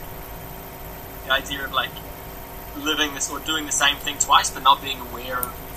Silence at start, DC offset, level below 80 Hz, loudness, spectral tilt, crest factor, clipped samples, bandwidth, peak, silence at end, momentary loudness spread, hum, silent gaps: 0 s; under 0.1%; -42 dBFS; -21 LUFS; -1 dB/octave; 24 dB; under 0.1%; 15 kHz; 0 dBFS; 0 s; 19 LU; none; none